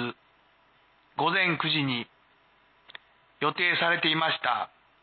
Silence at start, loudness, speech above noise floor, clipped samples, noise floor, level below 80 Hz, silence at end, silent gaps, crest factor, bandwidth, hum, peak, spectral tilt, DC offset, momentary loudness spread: 0 s; -26 LUFS; 37 dB; under 0.1%; -63 dBFS; -76 dBFS; 0.35 s; none; 18 dB; 4.7 kHz; none; -10 dBFS; -8.5 dB/octave; under 0.1%; 13 LU